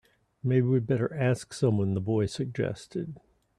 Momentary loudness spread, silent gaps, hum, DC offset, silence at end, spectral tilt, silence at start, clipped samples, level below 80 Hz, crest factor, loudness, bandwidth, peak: 11 LU; none; none; under 0.1%; 0.4 s; -7.5 dB/octave; 0.45 s; under 0.1%; -62 dBFS; 16 dB; -29 LUFS; 11.5 kHz; -12 dBFS